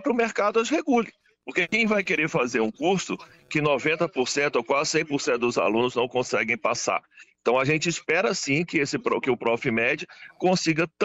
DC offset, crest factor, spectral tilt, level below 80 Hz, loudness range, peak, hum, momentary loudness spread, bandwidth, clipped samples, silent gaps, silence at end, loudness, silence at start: under 0.1%; 14 dB; -4 dB/octave; -62 dBFS; 1 LU; -10 dBFS; none; 5 LU; 8.2 kHz; under 0.1%; none; 0 s; -24 LUFS; 0 s